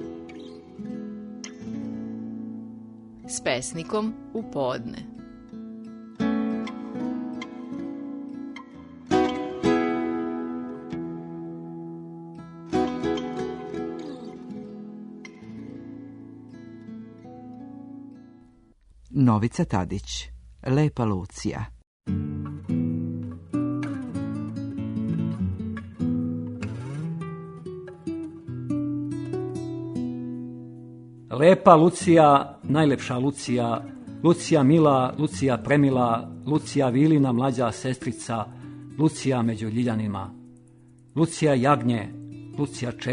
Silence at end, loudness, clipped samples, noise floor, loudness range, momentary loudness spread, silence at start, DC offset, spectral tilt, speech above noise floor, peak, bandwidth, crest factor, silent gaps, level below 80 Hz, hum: 0 s; -25 LUFS; under 0.1%; -56 dBFS; 13 LU; 21 LU; 0 s; under 0.1%; -6.5 dB/octave; 34 dB; 0 dBFS; 10.5 kHz; 26 dB; 21.87-22.00 s; -54 dBFS; none